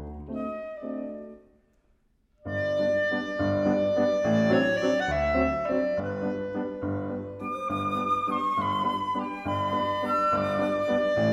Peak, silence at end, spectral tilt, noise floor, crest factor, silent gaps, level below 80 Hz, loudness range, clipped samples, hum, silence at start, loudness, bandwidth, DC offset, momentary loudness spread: -10 dBFS; 0 s; -6.5 dB/octave; -66 dBFS; 18 dB; none; -48 dBFS; 4 LU; under 0.1%; none; 0 s; -27 LUFS; 11.5 kHz; under 0.1%; 11 LU